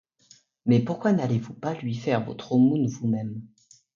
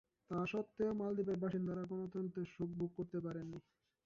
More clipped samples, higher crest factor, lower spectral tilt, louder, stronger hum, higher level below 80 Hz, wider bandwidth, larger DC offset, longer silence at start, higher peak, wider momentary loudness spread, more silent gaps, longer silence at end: neither; about the same, 16 dB vs 14 dB; about the same, -8 dB/octave vs -8 dB/octave; first, -25 LUFS vs -42 LUFS; neither; first, -64 dBFS vs -72 dBFS; about the same, 7.4 kHz vs 7.2 kHz; neither; first, 0.65 s vs 0.3 s; first, -10 dBFS vs -28 dBFS; first, 11 LU vs 7 LU; neither; about the same, 0.5 s vs 0.45 s